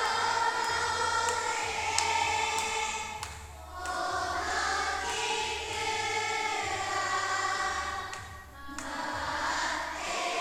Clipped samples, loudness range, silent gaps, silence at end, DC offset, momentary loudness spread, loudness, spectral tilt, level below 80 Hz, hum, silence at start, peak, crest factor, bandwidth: under 0.1%; 3 LU; none; 0 s; under 0.1%; 12 LU; -30 LUFS; -1 dB/octave; -54 dBFS; none; 0 s; -6 dBFS; 26 dB; 20 kHz